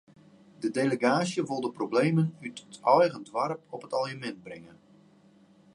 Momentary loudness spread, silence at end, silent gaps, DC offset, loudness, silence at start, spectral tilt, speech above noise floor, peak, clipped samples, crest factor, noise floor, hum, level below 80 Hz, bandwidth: 17 LU; 1.1 s; none; under 0.1%; -28 LUFS; 0.6 s; -6 dB/octave; 31 dB; -8 dBFS; under 0.1%; 22 dB; -59 dBFS; none; -76 dBFS; 11.5 kHz